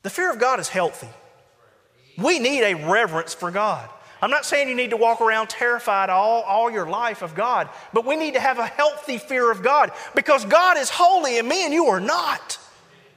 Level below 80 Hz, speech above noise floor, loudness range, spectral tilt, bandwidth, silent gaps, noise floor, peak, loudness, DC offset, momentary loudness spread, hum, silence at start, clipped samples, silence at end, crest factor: -72 dBFS; 37 dB; 4 LU; -3 dB/octave; 16 kHz; none; -57 dBFS; -4 dBFS; -20 LUFS; under 0.1%; 8 LU; none; 0.05 s; under 0.1%; 0.55 s; 18 dB